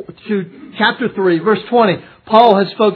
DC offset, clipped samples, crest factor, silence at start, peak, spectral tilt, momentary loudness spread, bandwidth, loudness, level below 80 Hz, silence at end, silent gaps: under 0.1%; 0.2%; 14 dB; 0 s; 0 dBFS; -8.5 dB/octave; 12 LU; 5.4 kHz; -14 LUFS; -62 dBFS; 0 s; none